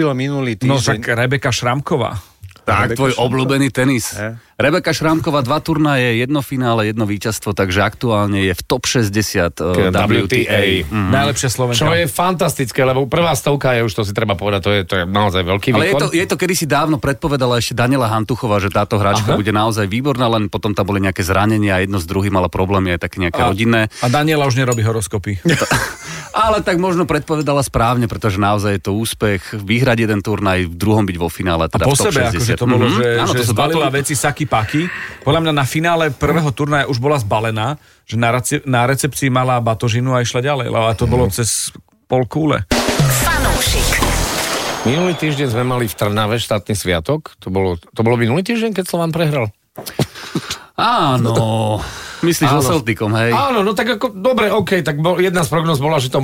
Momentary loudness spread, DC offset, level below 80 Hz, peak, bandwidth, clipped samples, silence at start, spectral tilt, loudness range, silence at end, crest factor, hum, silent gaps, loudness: 5 LU; under 0.1%; -34 dBFS; -2 dBFS; 16.5 kHz; under 0.1%; 0 s; -5 dB/octave; 2 LU; 0 s; 12 dB; none; none; -16 LUFS